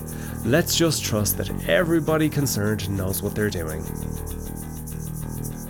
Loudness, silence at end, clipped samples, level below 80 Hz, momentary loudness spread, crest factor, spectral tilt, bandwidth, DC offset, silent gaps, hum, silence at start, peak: -24 LUFS; 0 s; under 0.1%; -38 dBFS; 13 LU; 16 dB; -4.5 dB/octave; over 20 kHz; under 0.1%; none; none; 0 s; -8 dBFS